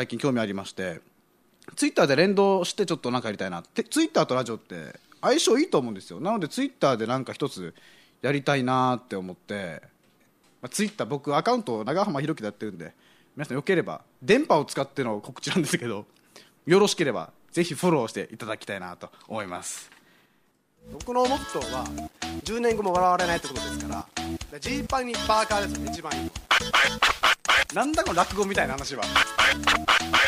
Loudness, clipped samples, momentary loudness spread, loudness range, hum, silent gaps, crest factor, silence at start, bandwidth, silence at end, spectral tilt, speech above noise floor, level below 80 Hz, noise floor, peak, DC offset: -25 LUFS; under 0.1%; 15 LU; 7 LU; none; none; 20 dB; 0 s; 15.5 kHz; 0 s; -4 dB/octave; 41 dB; -50 dBFS; -67 dBFS; -6 dBFS; under 0.1%